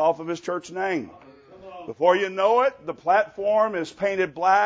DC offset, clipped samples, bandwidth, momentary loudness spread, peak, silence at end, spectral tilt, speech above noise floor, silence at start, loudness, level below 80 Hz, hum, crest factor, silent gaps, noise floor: under 0.1%; under 0.1%; 8 kHz; 11 LU; -6 dBFS; 0 s; -5 dB/octave; 20 dB; 0 s; -23 LUFS; -66 dBFS; none; 18 dB; none; -43 dBFS